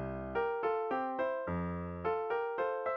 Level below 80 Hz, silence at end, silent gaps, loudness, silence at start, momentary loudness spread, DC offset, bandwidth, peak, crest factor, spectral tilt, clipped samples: -56 dBFS; 0 s; none; -36 LUFS; 0 s; 4 LU; under 0.1%; 5.4 kHz; -22 dBFS; 12 dB; -6 dB/octave; under 0.1%